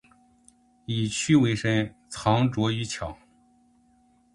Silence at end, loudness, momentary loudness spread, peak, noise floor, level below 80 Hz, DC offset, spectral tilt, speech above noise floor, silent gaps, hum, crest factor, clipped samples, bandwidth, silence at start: 1.2 s; -25 LUFS; 13 LU; -8 dBFS; -62 dBFS; -54 dBFS; under 0.1%; -5.5 dB/octave; 38 dB; none; none; 20 dB; under 0.1%; 11.5 kHz; 0.9 s